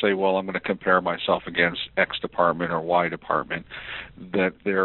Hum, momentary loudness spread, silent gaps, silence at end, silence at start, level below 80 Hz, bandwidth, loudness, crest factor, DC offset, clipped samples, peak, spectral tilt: none; 10 LU; none; 0 s; 0 s; -56 dBFS; 4.3 kHz; -24 LUFS; 20 dB; under 0.1%; under 0.1%; -4 dBFS; -2.5 dB/octave